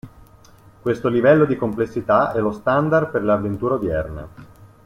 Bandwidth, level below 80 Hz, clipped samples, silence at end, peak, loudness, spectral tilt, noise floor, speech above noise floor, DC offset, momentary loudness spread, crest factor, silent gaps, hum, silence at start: 14 kHz; -46 dBFS; under 0.1%; 0.2 s; -2 dBFS; -19 LUFS; -8.5 dB/octave; -48 dBFS; 29 dB; under 0.1%; 12 LU; 18 dB; none; none; 0.05 s